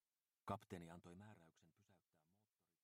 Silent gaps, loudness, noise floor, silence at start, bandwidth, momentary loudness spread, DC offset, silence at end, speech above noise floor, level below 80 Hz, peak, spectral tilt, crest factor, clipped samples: none; -57 LUFS; -89 dBFS; 0.45 s; 15.5 kHz; 11 LU; under 0.1%; 0.85 s; 33 dB; -82 dBFS; -34 dBFS; -6.5 dB/octave; 26 dB; under 0.1%